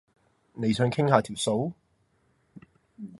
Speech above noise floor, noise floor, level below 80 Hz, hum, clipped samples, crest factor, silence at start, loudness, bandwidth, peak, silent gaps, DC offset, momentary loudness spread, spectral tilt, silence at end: 44 dB; -69 dBFS; -62 dBFS; none; under 0.1%; 26 dB; 0.55 s; -26 LUFS; 11.5 kHz; -4 dBFS; none; under 0.1%; 17 LU; -5.5 dB/octave; 0.05 s